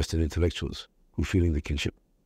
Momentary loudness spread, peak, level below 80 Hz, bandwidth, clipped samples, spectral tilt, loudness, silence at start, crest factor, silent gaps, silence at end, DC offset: 11 LU; -12 dBFS; -36 dBFS; 13.5 kHz; under 0.1%; -6 dB/octave; -29 LUFS; 0 s; 16 dB; none; 0.35 s; under 0.1%